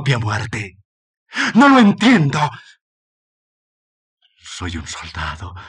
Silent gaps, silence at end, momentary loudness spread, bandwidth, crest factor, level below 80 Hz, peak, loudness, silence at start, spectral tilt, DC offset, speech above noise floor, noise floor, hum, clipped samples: 0.85-1.26 s, 2.81-4.17 s; 0 s; 18 LU; 10.5 kHz; 18 dB; -46 dBFS; -2 dBFS; -15 LUFS; 0 s; -5.5 dB/octave; under 0.1%; over 74 dB; under -90 dBFS; none; under 0.1%